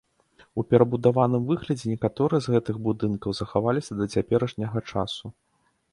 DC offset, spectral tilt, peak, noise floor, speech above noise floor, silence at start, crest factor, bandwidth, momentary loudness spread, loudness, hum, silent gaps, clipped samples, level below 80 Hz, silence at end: under 0.1%; -7.5 dB/octave; -4 dBFS; -59 dBFS; 35 dB; 0.55 s; 20 dB; 11.5 kHz; 10 LU; -25 LUFS; none; none; under 0.1%; -54 dBFS; 0.6 s